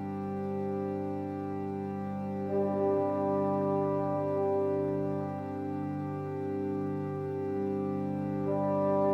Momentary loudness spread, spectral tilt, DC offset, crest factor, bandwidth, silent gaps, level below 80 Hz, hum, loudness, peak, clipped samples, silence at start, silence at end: 7 LU; -10.5 dB/octave; under 0.1%; 14 dB; 6 kHz; none; -76 dBFS; 50 Hz at -70 dBFS; -32 LUFS; -18 dBFS; under 0.1%; 0 s; 0 s